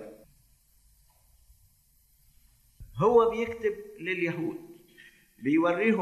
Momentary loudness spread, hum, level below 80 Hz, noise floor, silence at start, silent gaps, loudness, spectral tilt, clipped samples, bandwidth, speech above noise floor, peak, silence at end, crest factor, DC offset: 17 LU; none; -60 dBFS; -65 dBFS; 0 s; none; -27 LUFS; -7 dB/octave; under 0.1%; 13 kHz; 39 dB; -10 dBFS; 0 s; 20 dB; under 0.1%